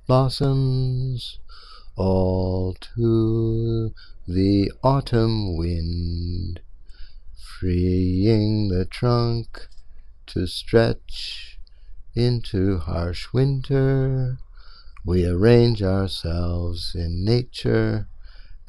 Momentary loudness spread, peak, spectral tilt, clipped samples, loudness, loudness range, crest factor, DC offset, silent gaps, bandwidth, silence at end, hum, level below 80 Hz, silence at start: 12 LU; -2 dBFS; -8 dB/octave; under 0.1%; -22 LUFS; 4 LU; 20 dB; under 0.1%; none; 11.5 kHz; 0.05 s; none; -36 dBFS; 0.1 s